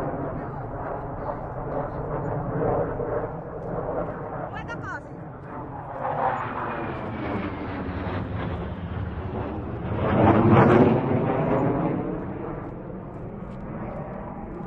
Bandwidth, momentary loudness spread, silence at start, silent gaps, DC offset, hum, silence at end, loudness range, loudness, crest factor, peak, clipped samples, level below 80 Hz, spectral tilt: 6.8 kHz; 17 LU; 0 s; none; under 0.1%; none; 0 s; 10 LU; -27 LUFS; 22 dB; -4 dBFS; under 0.1%; -42 dBFS; -10 dB/octave